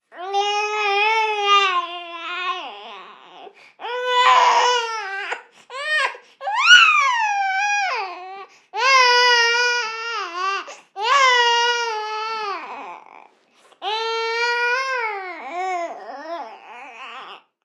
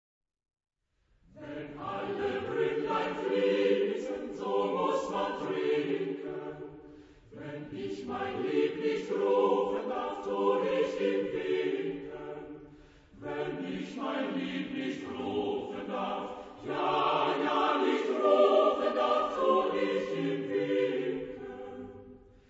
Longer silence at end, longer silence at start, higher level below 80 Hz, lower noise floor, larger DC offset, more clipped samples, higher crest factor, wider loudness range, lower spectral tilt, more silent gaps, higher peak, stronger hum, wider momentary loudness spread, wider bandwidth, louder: about the same, 0.25 s vs 0.35 s; second, 0.15 s vs 1.35 s; second, under -90 dBFS vs -66 dBFS; second, -55 dBFS vs -72 dBFS; neither; neither; about the same, 20 dB vs 20 dB; about the same, 8 LU vs 8 LU; second, 2.5 dB/octave vs -6 dB/octave; neither; first, 0 dBFS vs -12 dBFS; neither; first, 22 LU vs 15 LU; first, 12.5 kHz vs 8 kHz; first, -18 LUFS vs -31 LUFS